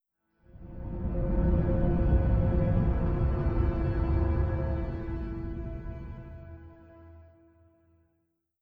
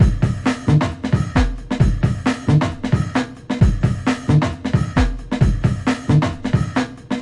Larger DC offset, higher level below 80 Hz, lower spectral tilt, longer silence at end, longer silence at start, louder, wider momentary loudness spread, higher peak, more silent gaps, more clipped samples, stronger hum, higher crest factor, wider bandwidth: neither; second, -32 dBFS vs -26 dBFS; first, -11.5 dB/octave vs -7 dB/octave; first, 1.4 s vs 0 s; first, 0.55 s vs 0 s; second, -30 LUFS vs -19 LUFS; first, 17 LU vs 5 LU; second, -14 dBFS vs 0 dBFS; neither; neither; neither; about the same, 16 dB vs 16 dB; second, 4.6 kHz vs 11 kHz